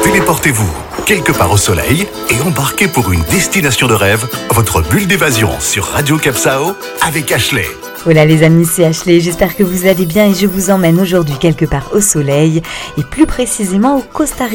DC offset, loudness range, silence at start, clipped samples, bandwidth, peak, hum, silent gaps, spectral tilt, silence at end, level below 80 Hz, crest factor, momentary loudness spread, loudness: under 0.1%; 2 LU; 0 s; 0.2%; 17.5 kHz; 0 dBFS; none; none; -4.5 dB/octave; 0 s; -30 dBFS; 10 dB; 6 LU; -11 LUFS